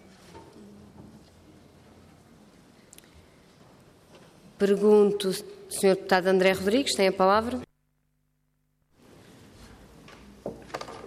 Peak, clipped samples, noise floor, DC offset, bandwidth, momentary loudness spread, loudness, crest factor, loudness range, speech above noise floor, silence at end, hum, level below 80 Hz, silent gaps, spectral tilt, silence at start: -8 dBFS; under 0.1%; -73 dBFS; under 0.1%; 15.5 kHz; 19 LU; -24 LUFS; 20 dB; 11 LU; 50 dB; 0 s; 50 Hz at -70 dBFS; -62 dBFS; none; -4.5 dB/octave; 0.35 s